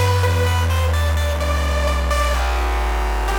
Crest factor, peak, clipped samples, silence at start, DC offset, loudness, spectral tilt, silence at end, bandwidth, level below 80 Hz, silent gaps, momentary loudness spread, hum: 12 dB; -6 dBFS; under 0.1%; 0 s; under 0.1%; -19 LUFS; -5 dB/octave; 0 s; 18.5 kHz; -20 dBFS; none; 4 LU; none